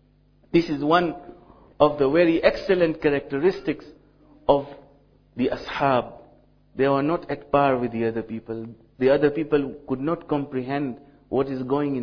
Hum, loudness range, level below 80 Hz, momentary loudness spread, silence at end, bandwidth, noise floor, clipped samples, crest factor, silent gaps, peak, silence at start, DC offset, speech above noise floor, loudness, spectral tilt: none; 4 LU; -52 dBFS; 13 LU; 0 s; 5.4 kHz; -58 dBFS; under 0.1%; 20 dB; none; -4 dBFS; 0.55 s; under 0.1%; 36 dB; -23 LUFS; -8 dB/octave